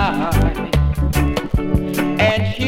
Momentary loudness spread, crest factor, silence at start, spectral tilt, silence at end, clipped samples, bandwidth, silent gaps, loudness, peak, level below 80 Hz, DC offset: 4 LU; 16 dB; 0 s; -6 dB/octave; 0 s; under 0.1%; 16.5 kHz; none; -18 LUFS; -2 dBFS; -22 dBFS; under 0.1%